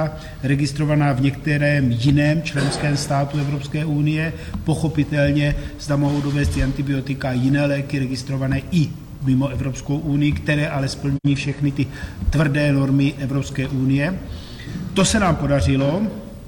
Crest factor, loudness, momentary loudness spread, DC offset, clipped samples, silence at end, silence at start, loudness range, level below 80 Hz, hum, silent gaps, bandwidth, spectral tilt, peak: 12 dB; -20 LUFS; 8 LU; under 0.1%; under 0.1%; 0 s; 0 s; 2 LU; -34 dBFS; none; none; 17.5 kHz; -6.5 dB/octave; -6 dBFS